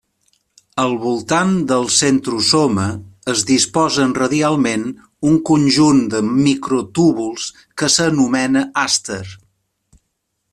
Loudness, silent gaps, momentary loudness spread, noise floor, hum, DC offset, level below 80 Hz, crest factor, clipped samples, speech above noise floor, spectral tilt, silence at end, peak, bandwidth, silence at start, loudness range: -16 LUFS; none; 10 LU; -72 dBFS; none; under 0.1%; -52 dBFS; 16 dB; under 0.1%; 56 dB; -4 dB/octave; 1.15 s; 0 dBFS; 13 kHz; 0.75 s; 2 LU